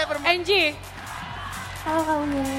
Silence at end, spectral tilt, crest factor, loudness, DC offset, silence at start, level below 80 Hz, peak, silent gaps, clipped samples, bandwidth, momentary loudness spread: 0 s; -4 dB/octave; 18 dB; -24 LUFS; under 0.1%; 0 s; -46 dBFS; -6 dBFS; none; under 0.1%; 17 kHz; 15 LU